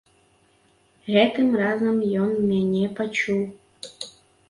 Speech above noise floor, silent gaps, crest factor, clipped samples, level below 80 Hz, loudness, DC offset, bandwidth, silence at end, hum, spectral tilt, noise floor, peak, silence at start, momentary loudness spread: 40 dB; none; 18 dB; under 0.1%; -62 dBFS; -22 LUFS; under 0.1%; 11.5 kHz; 0.4 s; none; -6 dB/octave; -61 dBFS; -6 dBFS; 1.05 s; 18 LU